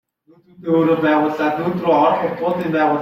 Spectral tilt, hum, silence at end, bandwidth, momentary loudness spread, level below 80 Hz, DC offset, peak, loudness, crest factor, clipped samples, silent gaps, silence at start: -8 dB/octave; none; 0 s; 14 kHz; 5 LU; -60 dBFS; under 0.1%; -4 dBFS; -17 LUFS; 14 dB; under 0.1%; none; 0.6 s